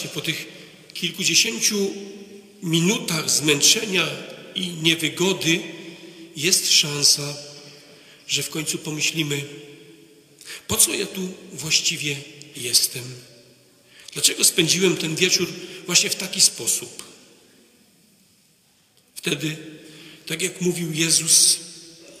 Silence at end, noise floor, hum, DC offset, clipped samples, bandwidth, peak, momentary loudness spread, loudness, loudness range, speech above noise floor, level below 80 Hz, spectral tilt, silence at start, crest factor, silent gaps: 0 s; -60 dBFS; none; under 0.1%; under 0.1%; 16 kHz; 0 dBFS; 21 LU; -19 LUFS; 8 LU; 38 dB; -64 dBFS; -1.5 dB/octave; 0 s; 22 dB; none